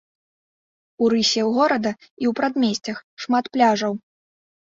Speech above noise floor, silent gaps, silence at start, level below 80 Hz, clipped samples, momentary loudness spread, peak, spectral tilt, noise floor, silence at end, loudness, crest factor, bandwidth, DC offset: over 69 dB; 2.11-2.17 s, 3.03-3.17 s; 1 s; -66 dBFS; under 0.1%; 10 LU; -6 dBFS; -4 dB/octave; under -90 dBFS; 0.75 s; -21 LUFS; 18 dB; 7.6 kHz; under 0.1%